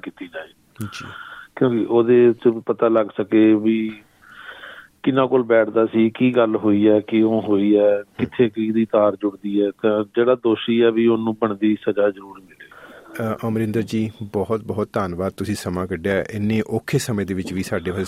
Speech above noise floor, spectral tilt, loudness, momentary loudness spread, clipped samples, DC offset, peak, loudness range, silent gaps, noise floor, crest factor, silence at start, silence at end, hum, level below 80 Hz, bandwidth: 24 dB; -7 dB/octave; -19 LUFS; 17 LU; under 0.1%; under 0.1%; -4 dBFS; 6 LU; none; -43 dBFS; 16 dB; 0.05 s; 0 s; none; -58 dBFS; 14.5 kHz